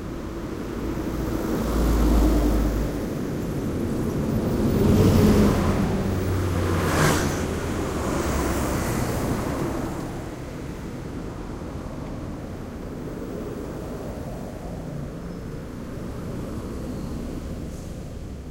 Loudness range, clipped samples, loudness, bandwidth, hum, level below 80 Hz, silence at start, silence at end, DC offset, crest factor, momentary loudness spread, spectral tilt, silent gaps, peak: 12 LU; under 0.1%; -26 LUFS; 16 kHz; none; -32 dBFS; 0 s; 0 s; under 0.1%; 20 dB; 14 LU; -6.5 dB/octave; none; -6 dBFS